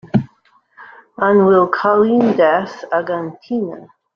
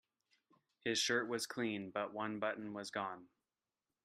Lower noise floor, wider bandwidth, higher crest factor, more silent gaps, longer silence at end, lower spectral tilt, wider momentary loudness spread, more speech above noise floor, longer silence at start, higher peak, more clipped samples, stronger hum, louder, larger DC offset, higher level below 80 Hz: second, -56 dBFS vs under -90 dBFS; second, 6.6 kHz vs 15.5 kHz; second, 14 dB vs 20 dB; neither; second, 0.3 s vs 0.8 s; first, -8.5 dB/octave vs -2.5 dB/octave; about the same, 12 LU vs 10 LU; second, 41 dB vs over 50 dB; second, 0.05 s vs 0.85 s; first, -2 dBFS vs -22 dBFS; neither; neither; first, -15 LUFS vs -40 LUFS; neither; first, -56 dBFS vs -84 dBFS